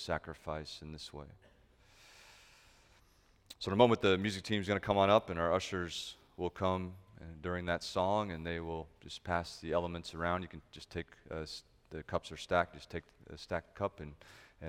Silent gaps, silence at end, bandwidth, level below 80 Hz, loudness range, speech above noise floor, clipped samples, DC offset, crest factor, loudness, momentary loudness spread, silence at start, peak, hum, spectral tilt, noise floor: none; 0 s; 16 kHz; -58 dBFS; 8 LU; 31 dB; under 0.1%; under 0.1%; 26 dB; -36 LUFS; 21 LU; 0 s; -10 dBFS; none; -5.5 dB/octave; -67 dBFS